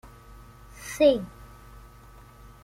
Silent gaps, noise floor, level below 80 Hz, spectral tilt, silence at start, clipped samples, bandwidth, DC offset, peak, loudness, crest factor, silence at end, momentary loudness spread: none; -50 dBFS; -50 dBFS; -4.5 dB/octave; 0.8 s; under 0.1%; 16 kHz; under 0.1%; -8 dBFS; -24 LUFS; 22 dB; 1.4 s; 27 LU